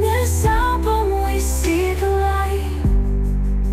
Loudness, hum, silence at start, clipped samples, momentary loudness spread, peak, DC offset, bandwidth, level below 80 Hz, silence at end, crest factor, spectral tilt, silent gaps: -19 LUFS; none; 0 s; under 0.1%; 4 LU; -8 dBFS; under 0.1%; 16 kHz; -20 dBFS; 0 s; 10 dB; -5.5 dB/octave; none